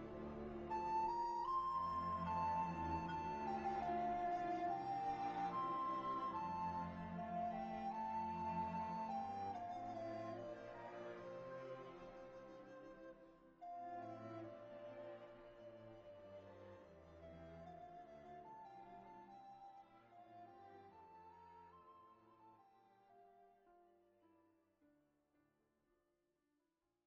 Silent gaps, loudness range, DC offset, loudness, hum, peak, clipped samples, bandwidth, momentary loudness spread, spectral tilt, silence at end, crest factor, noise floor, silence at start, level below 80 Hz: none; 19 LU; under 0.1%; -46 LUFS; none; -32 dBFS; under 0.1%; 7.8 kHz; 20 LU; -5.5 dB/octave; 3.2 s; 16 dB; -88 dBFS; 0 s; -70 dBFS